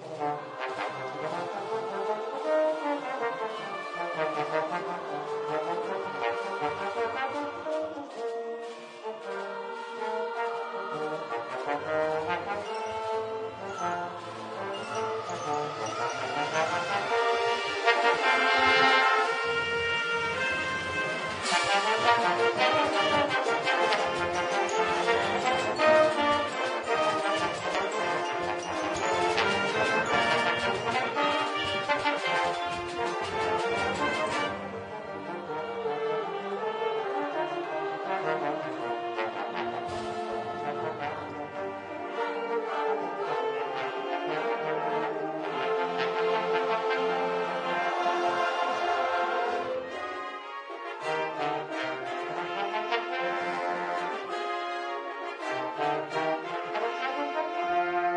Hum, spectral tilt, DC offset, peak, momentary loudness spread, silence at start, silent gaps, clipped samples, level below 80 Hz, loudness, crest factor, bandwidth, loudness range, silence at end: none; -3.5 dB/octave; under 0.1%; -8 dBFS; 10 LU; 0 s; none; under 0.1%; -66 dBFS; -29 LUFS; 22 dB; 10 kHz; 8 LU; 0 s